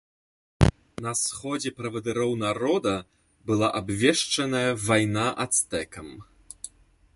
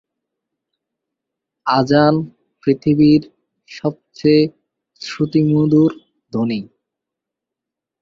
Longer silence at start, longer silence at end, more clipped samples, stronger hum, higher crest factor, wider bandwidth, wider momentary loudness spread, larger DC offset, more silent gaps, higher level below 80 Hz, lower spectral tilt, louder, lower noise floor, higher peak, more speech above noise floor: second, 0.6 s vs 1.65 s; second, 0.5 s vs 1.35 s; neither; neither; first, 24 dB vs 16 dB; first, 12 kHz vs 7.2 kHz; first, 18 LU vs 14 LU; neither; neither; first, -42 dBFS vs -54 dBFS; second, -4 dB/octave vs -8 dB/octave; second, -25 LUFS vs -16 LUFS; second, -53 dBFS vs -84 dBFS; about the same, -2 dBFS vs -2 dBFS; second, 27 dB vs 69 dB